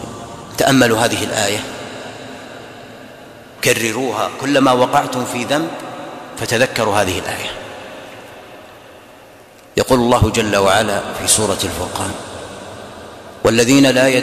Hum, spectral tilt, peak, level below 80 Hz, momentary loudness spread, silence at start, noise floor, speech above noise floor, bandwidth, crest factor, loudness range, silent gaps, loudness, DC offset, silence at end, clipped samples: none; -3.5 dB/octave; 0 dBFS; -42 dBFS; 22 LU; 0 s; -42 dBFS; 27 dB; 15.5 kHz; 16 dB; 5 LU; none; -15 LUFS; under 0.1%; 0 s; under 0.1%